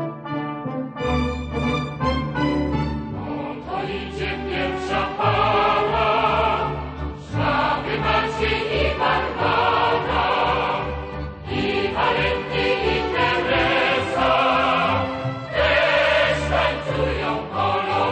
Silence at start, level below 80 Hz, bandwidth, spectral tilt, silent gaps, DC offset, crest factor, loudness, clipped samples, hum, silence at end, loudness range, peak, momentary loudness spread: 0 s; -36 dBFS; 9 kHz; -6 dB/octave; none; under 0.1%; 16 dB; -21 LUFS; under 0.1%; none; 0 s; 5 LU; -6 dBFS; 10 LU